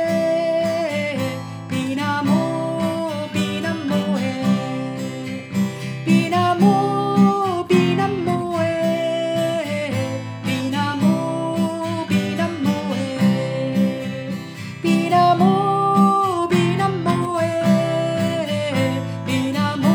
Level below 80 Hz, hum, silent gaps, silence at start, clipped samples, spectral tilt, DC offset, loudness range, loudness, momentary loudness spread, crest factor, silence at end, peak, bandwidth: -60 dBFS; none; none; 0 s; under 0.1%; -6.5 dB/octave; under 0.1%; 4 LU; -20 LUFS; 9 LU; 16 dB; 0 s; -4 dBFS; 19.5 kHz